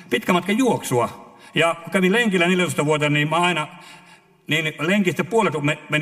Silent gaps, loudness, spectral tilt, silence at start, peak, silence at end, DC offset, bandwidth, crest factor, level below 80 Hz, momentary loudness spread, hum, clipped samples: none; -20 LUFS; -5 dB/octave; 0 s; -2 dBFS; 0 s; under 0.1%; 15.5 kHz; 18 dB; -64 dBFS; 6 LU; none; under 0.1%